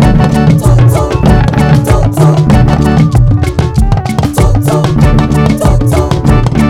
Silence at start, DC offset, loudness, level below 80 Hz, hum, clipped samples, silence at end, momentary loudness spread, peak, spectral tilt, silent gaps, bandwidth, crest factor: 0 s; under 0.1%; -8 LUFS; -14 dBFS; none; 6%; 0 s; 4 LU; 0 dBFS; -7.5 dB/octave; none; 15 kHz; 6 dB